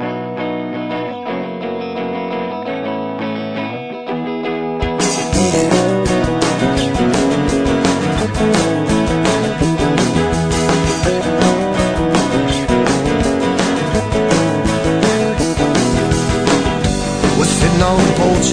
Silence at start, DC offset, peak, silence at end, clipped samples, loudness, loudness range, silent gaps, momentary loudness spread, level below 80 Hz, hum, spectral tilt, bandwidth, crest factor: 0 s; 0.6%; 0 dBFS; 0 s; under 0.1%; -16 LUFS; 7 LU; none; 9 LU; -30 dBFS; none; -5 dB/octave; 10 kHz; 14 dB